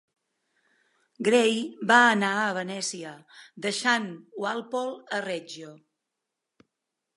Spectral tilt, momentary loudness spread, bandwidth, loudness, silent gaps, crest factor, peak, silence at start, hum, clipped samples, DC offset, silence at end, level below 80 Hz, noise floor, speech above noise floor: -3 dB/octave; 18 LU; 11.5 kHz; -25 LUFS; none; 24 dB; -6 dBFS; 1.2 s; none; under 0.1%; under 0.1%; 1.4 s; -82 dBFS; -85 dBFS; 59 dB